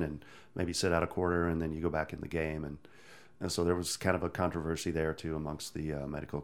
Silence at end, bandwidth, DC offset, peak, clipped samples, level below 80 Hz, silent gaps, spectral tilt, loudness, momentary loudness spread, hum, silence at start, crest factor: 0 s; 17.5 kHz; 0.1%; -12 dBFS; under 0.1%; -50 dBFS; none; -5 dB/octave; -34 LUFS; 9 LU; none; 0 s; 22 dB